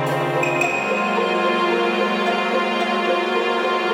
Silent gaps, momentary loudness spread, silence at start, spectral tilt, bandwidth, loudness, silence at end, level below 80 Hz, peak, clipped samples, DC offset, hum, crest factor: none; 1 LU; 0 s; -4.5 dB/octave; 17 kHz; -19 LUFS; 0 s; -68 dBFS; -6 dBFS; under 0.1%; under 0.1%; none; 14 dB